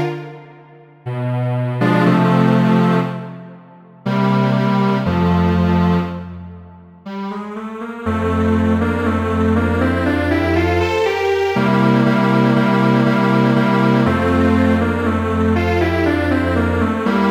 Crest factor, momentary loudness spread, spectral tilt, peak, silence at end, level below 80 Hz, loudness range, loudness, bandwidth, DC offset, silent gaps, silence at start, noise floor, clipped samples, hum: 14 dB; 14 LU; -8 dB/octave; -2 dBFS; 0 s; -36 dBFS; 5 LU; -16 LUFS; 14 kHz; under 0.1%; none; 0 s; -43 dBFS; under 0.1%; none